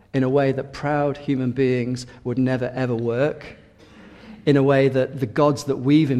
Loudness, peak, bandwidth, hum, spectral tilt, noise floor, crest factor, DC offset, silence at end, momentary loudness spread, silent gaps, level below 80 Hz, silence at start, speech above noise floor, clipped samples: -21 LUFS; -4 dBFS; 12.5 kHz; none; -7.5 dB/octave; -47 dBFS; 16 dB; under 0.1%; 0 s; 9 LU; none; -54 dBFS; 0.15 s; 27 dB; under 0.1%